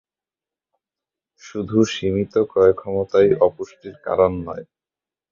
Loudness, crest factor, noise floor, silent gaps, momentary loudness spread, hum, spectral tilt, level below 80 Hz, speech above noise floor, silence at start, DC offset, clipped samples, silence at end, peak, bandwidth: -19 LUFS; 18 dB; under -90 dBFS; none; 17 LU; none; -6.5 dB/octave; -48 dBFS; over 71 dB; 1.45 s; under 0.1%; under 0.1%; 0.7 s; -2 dBFS; 7.4 kHz